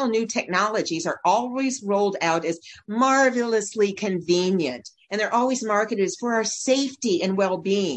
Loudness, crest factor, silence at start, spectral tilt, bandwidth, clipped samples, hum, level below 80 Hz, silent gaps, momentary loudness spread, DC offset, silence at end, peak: -23 LUFS; 16 dB; 0 s; -4 dB/octave; 9.4 kHz; under 0.1%; none; -70 dBFS; none; 6 LU; under 0.1%; 0 s; -6 dBFS